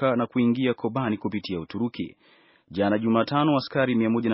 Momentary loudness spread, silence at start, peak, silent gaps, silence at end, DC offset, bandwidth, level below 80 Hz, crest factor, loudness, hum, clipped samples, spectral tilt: 9 LU; 0 s; -8 dBFS; none; 0 s; under 0.1%; 5.8 kHz; -62 dBFS; 16 dB; -25 LUFS; none; under 0.1%; -5.5 dB/octave